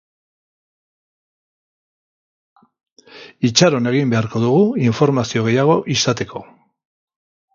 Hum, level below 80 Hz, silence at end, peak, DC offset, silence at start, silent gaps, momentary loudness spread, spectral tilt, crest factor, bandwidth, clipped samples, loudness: none; -56 dBFS; 1.1 s; 0 dBFS; under 0.1%; 3.15 s; none; 8 LU; -5 dB/octave; 18 dB; 7.6 kHz; under 0.1%; -16 LUFS